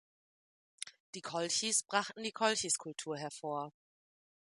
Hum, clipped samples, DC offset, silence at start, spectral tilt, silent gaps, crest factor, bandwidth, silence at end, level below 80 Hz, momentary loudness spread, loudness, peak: none; under 0.1%; under 0.1%; 0.8 s; -1.5 dB/octave; 1.00-1.13 s; 22 dB; 11.5 kHz; 0.85 s; -82 dBFS; 16 LU; -35 LUFS; -16 dBFS